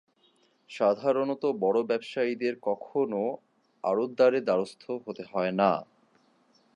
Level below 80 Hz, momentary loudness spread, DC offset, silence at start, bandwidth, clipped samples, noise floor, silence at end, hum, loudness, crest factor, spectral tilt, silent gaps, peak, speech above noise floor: -80 dBFS; 11 LU; under 0.1%; 0.7 s; 10.5 kHz; under 0.1%; -67 dBFS; 0.9 s; none; -28 LUFS; 20 dB; -6.5 dB/octave; none; -8 dBFS; 39 dB